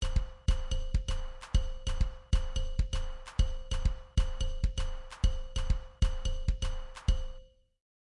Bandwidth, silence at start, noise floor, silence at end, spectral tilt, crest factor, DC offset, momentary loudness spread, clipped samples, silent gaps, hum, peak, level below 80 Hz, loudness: 11 kHz; 0 s; -51 dBFS; 0.65 s; -5 dB/octave; 16 dB; under 0.1%; 6 LU; under 0.1%; none; none; -16 dBFS; -32 dBFS; -36 LUFS